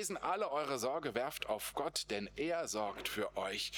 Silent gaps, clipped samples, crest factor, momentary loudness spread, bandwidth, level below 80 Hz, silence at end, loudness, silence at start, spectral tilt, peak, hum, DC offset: none; under 0.1%; 20 dB; 2 LU; over 20 kHz; -66 dBFS; 0 s; -38 LUFS; 0 s; -2.5 dB/octave; -18 dBFS; none; under 0.1%